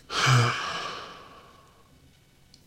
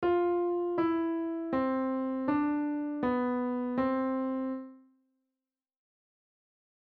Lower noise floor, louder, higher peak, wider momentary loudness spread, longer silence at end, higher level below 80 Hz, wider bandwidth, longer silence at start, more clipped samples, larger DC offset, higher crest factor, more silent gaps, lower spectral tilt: second, -58 dBFS vs under -90 dBFS; first, -25 LUFS vs -31 LUFS; first, -8 dBFS vs -18 dBFS; first, 22 LU vs 4 LU; second, 1.3 s vs 2.15 s; first, -60 dBFS vs -66 dBFS; first, 13.5 kHz vs 4.6 kHz; about the same, 0.1 s vs 0 s; neither; neither; first, 20 dB vs 14 dB; neither; second, -4 dB/octave vs -9 dB/octave